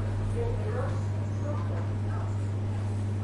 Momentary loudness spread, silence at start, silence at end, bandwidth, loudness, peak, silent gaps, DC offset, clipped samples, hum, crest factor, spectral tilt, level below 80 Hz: 1 LU; 0 s; 0 s; 10.5 kHz; -31 LUFS; -20 dBFS; none; under 0.1%; under 0.1%; none; 10 dB; -8 dB/octave; -42 dBFS